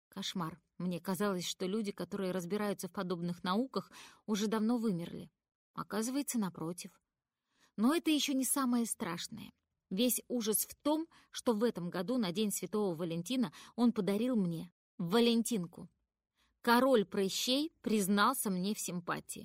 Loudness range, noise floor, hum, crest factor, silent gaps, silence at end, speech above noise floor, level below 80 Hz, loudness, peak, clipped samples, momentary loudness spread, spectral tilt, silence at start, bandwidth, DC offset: 5 LU; -90 dBFS; none; 20 dB; 5.55-5.74 s, 14.72-14.98 s; 0 s; 56 dB; -76 dBFS; -35 LUFS; -16 dBFS; under 0.1%; 13 LU; -4.5 dB/octave; 0.15 s; 16 kHz; under 0.1%